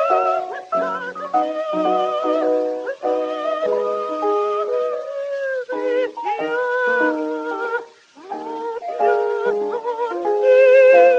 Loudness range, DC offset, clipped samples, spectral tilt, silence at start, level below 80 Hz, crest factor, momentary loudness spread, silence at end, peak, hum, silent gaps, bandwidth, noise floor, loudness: 3 LU; under 0.1%; under 0.1%; -5 dB/octave; 0 s; -76 dBFS; 18 dB; 10 LU; 0 s; -2 dBFS; none; none; 7.4 kHz; -41 dBFS; -20 LUFS